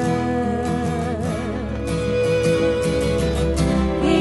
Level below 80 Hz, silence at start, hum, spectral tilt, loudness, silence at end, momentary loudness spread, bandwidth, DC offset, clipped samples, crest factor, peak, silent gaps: -30 dBFS; 0 s; none; -6.5 dB/octave; -21 LUFS; 0 s; 6 LU; 11.5 kHz; under 0.1%; under 0.1%; 14 dB; -6 dBFS; none